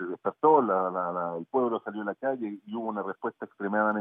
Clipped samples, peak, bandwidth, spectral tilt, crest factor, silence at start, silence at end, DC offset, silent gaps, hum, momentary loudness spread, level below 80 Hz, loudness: under 0.1%; -8 dBFS; 3.7 kHz; -10.5 dB/octave; 20 dB; 0 s; 0 s; under 0.1%; none; none; 13 LU; under -90 dBFS; -29 LUFS